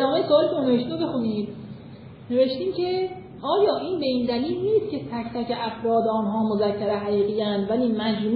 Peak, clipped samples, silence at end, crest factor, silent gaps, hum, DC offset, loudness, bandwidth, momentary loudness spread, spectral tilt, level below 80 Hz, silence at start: -8 dBFS; under 0.1%; 0 s; 16 dB; none; none; under 0.1%; -24 LUFS; 5.2 kHz; 9 LU; -11 dB/octave; -58 dBFS; 0 s